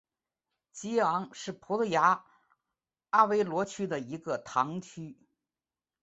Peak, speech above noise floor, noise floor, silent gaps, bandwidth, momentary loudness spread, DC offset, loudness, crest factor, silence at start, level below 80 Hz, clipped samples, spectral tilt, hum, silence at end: -10 dBFS; over 60 dB; under -90 dBFS; none; 8.2 kHz; 17 LU; under 0.1%; -30 LUFS; 22 dB; 0.75 s; -74 dBFS; under 0.1%; -5 dB/octave; none; 0.9 s